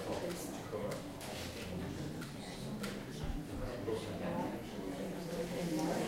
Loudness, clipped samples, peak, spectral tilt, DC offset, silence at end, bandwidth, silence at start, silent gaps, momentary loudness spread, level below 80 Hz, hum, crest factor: -42 LUFS; under 0.1%; -24 dBFS; -5.5 dB/octave; under 0.1%; 0 s; 16 kHz; 0 s; none; 5 LU; -54 dBFS; none; 16 dB